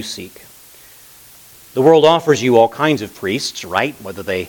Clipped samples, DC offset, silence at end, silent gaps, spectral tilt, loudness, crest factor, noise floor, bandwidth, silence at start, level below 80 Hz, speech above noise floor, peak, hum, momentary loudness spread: under 0.1%; under 0.1%; 0 s; none; -4.5 dB/octave; -15 LUFS; 16 dB; -43 dBFS; 19 kHz; 0 s; -58 dBFS; 28 dB; 0 dBFS; none; 17 LU